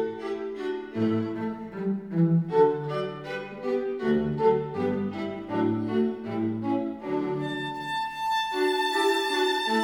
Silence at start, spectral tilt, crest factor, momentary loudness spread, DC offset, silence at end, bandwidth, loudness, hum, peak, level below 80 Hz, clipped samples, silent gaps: 0 s; -6 dB/octave; 16 dB; 9 LU; under 0.1%; 0 s; 20 kHz; -27 LUFS; none; -10 dBFS; -62 dBFS; under 0.1%; none